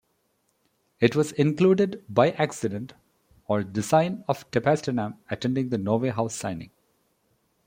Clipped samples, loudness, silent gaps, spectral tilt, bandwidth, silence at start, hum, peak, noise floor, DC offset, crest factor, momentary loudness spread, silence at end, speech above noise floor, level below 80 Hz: under 0.1%; -25 LUFS; none; -6 dB/octave; 16.5 kHz; 1 s; none; -4 dBFS; -71 dBFS; under 0.1%; 22 dB; 11 LU; 1 s; 47 dB; -64 dBFS